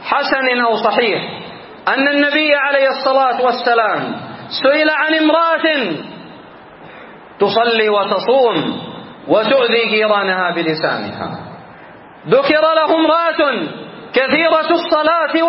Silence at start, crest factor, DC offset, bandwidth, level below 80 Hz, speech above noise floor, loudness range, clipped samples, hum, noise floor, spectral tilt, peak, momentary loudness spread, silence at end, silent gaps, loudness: 0 s; 16 dB; under 0.1%; 5.8 kHz; -60 dBFS; 24 dB; 2 LU; under 0.1%; none; -38 dBFS; -8.5 dB/octave; 0 dBFS; 14 LU; 0 s; none; -14 LUFS